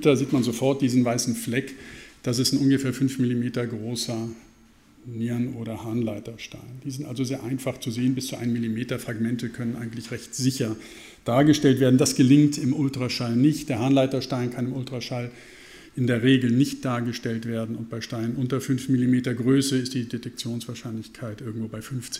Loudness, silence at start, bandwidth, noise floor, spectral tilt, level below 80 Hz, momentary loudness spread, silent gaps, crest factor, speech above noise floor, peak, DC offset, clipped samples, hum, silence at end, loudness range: -25 LUFS; 0 s; 16 kHz; -55 dBFS; -5.5 dB/octave; -58 dBFS; 15 LU; none; 18 dB; 30 dB; -6 dBFS; under 0.1%; under 0.1%; none; 0 s; 8 LU